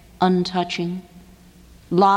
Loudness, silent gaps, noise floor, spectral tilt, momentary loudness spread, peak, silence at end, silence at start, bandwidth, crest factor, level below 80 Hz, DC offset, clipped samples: -22 LUFS; none; -48 dBFS; -6.5 dB/octave; 10 LU; -4 dBFS; 0 s; 0.2 s; 10.5 kHz; 16 dB; -52 dBFS; under 0.1%; under 0.1%